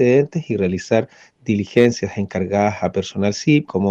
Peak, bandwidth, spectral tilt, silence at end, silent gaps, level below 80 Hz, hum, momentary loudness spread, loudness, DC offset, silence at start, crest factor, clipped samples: -2 dBFS; 8.4 kHz; -6.5 dB/octave; 0 s; none; -54 dBFS; none; 8 LU; -19 LUFS; under 0.1%; 0 s; 16 dB; under 0.1%